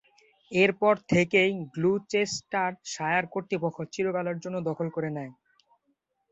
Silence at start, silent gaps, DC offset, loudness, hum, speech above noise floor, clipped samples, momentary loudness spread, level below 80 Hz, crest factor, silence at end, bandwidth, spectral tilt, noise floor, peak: 0.5 s; none; under 0.1%; -27 LUFS; none; 48 dB; under 0.1%; 10 LU; -66 dBFS; 20 dB; 1 s; 8.2 kHz; -5 dB/octave; -76 dBFS; -8 dBFS